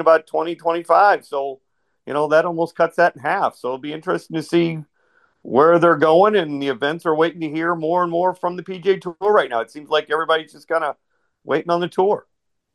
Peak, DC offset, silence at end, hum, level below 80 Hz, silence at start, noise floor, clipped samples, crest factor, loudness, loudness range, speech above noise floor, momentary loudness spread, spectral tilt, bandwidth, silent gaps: -2 dBFS; under 0.1%; 0.55 s; none; -70 dBFS; 0 s; -61 dBFS; under 0.1%; 18 dB; -19 LUFS; 4 LU; 43 dB; 12 LU; -6 dB/octave; 12.5 kHz; none